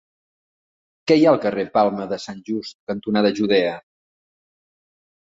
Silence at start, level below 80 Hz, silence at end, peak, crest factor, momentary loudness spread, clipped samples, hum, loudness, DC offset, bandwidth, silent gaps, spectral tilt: 1.05 s; -62 dBFS; 1.4 s; -2 dBFS; 20 dB; 14 LU; under 0.1%; none; -20 LUFS; under 0.1%; 7.8 kHz; 2.75-2.87 s; -6 dB/octave